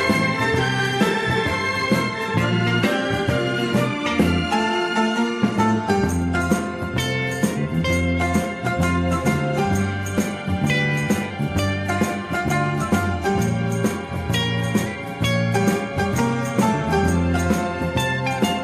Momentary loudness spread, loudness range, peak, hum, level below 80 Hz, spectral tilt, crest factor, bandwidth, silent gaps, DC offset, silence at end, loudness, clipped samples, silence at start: 4 LU; 2 LU; -4 dBFS; none; -40 dBFS; -5.5 dB/octave; 16 dB; 15.5 kHz; none; under 0.1%; 0 s; -21 LUFS; under 0.1%; 0 s